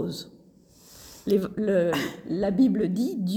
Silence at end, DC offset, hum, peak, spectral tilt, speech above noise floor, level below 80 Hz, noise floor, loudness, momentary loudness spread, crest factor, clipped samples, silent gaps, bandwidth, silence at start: 0 s; under 0.1%; none; -12 dBFS; -6.5 dB/octave; 30 dB; -58 dBFS; -55 dBFS; -25 LUFS; 16 LU; 14 dB; under 0.1%; none; 18.5 kHz; 0 s